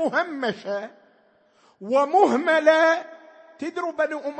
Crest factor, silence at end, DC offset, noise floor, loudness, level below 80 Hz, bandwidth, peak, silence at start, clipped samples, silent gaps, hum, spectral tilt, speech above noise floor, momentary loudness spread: 20 dB; 0 s; under 0.1%; -60 dBFS; -22 LUFS; -80 dBFS; 8.6 kHz; -4 dBFS; 0 s; under 0.1%; none; none; -4 dB/octave; 39 dB; 17 LU